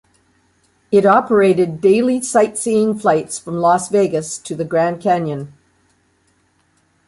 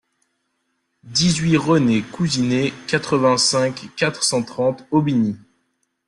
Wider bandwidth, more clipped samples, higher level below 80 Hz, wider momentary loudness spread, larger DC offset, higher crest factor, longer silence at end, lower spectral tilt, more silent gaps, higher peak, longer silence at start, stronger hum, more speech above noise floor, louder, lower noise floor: about the same, 11.5 kHz vs 12 kHz; neither; second, -60 dBFS vs -54 dBFS; first, 12 LU vs 7 LU; neither; about the same, 16 dB vs 16 dB; first, 1.6 s vs 0.7 s; about the same, -5.5 dB/octave vs -4.5 dB/octave; neither; about the same, -2 dBFS vs -4 dBFS; second, 0.9 s vs 1.05 s; neither; second, 45 dB vs 53 dB; first, -16 LUFS vs -19 LUFS; second, -60 dBFS vs -71 dBFS